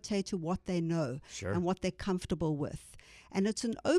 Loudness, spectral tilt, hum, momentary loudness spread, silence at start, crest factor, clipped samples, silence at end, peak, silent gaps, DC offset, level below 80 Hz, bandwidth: -35 LUFS; -6 dB/octave; none; 8 LU; 0.05 s; 18 dB; under 0.1%; 0 s; -16 dBFS; none; under 0.1%; -56 dBFS; 12.5 kHz